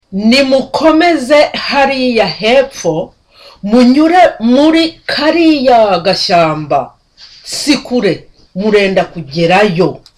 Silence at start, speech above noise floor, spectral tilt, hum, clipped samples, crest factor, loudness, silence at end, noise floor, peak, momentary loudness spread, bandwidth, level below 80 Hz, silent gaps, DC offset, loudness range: 0.1 s; 30 dB; -5 dB/octave; none; under 0.1%; 10 dB; -10 LUFS; 0.2 s; -39 dBFS; 0 dBFS; 10 LU; 14 kHz; -42 dBFS; none; under 0.1%; 4 LU